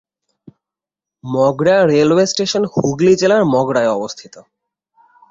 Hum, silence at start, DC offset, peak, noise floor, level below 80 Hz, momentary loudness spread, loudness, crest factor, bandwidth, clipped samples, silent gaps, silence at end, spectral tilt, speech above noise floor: none; 1.25 s; under 0.1%; -2 dBFS; -87 dBFS; -56 dBFS; 11 LU; -14 LUFS; 14 dB; 8 kHz; under 0.1%; none; 0.9 s; -5 dB/octave; 73 dB